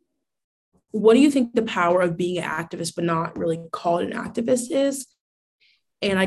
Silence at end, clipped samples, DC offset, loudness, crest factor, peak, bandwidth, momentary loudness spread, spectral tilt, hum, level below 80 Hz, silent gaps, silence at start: 0 s; under 0.1%; under 0.1%; -22 LUFS; 18 dB; -4 dBFS; 12.5 kHz; 11 LU; -5 dB/octave; none; -60 dBFS; 5.20-5.59 s; 0.95 s